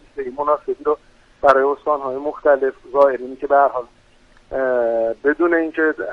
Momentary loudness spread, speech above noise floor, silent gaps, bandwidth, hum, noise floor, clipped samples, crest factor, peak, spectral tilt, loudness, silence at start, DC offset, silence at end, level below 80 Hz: 9 LU; 33 dB; none; 6.6 kHz; none; -51 dBFS; under 0.1%; 18 dB; 0 dBFS; -6.5 dB/octave; -18 LUFS; 0.15 s; under 0.1%; 0 s; -52 dBFS